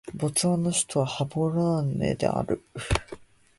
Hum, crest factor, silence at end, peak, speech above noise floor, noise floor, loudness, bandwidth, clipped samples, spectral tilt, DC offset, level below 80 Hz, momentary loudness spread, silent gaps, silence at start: none; 18 dB; 0.35 s; -8 dBFS; 20 dB; -46 dBFS; -26 LUFS; 12 kHz; under 0.1%; -5 dB/octave; under 0.1%; -44 dBFS; 7 LU; none; 0.05 s